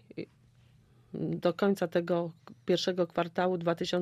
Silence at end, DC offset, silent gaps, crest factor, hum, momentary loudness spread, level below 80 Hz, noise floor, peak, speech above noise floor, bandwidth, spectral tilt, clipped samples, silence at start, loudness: 0 s; under 0.1%; none; 18 dB; none; 16 LU; -70 dBFS; -62 dBFS; -14 dBFS; 32 dB; 15 kHz; -6 dB/octave; under 0.1%; 0.15 s; -31 LUFS